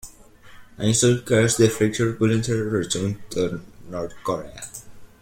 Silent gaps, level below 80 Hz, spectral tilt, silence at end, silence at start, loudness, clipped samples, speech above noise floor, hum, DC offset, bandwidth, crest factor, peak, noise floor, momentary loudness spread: none; -50 dBFS; -5 dB/octave; 0.15 s; 0.05 s; -22 LUFS; under 0.1%; 26 dB; none; under 0.1%; 16.5 kHz; 20 dB; -4 dBFS; -47 dBFS; 17 LU